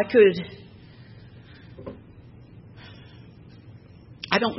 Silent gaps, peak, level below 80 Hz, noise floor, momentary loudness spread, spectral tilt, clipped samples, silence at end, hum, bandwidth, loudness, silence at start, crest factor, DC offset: none; -4 dBFS; -58 dBFS; -47 dBFS; 28 LU; -7 dB/octave; under 0.1%; 0 s; none; 6 kHz; -21 LUFS; 0 s; 24 dB; under 0.1%